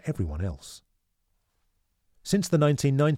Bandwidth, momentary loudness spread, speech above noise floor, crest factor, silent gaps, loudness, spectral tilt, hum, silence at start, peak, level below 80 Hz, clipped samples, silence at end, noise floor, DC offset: 15.5 kHz; 20 LU; 49 dB; 18 dB; none; -26 LUFS; -6.5 dB/octave; none; 0.05 s; -10 dBFS; -46 dBFS; under 0.1%; 0 s; -74 dBFS; under 0.1%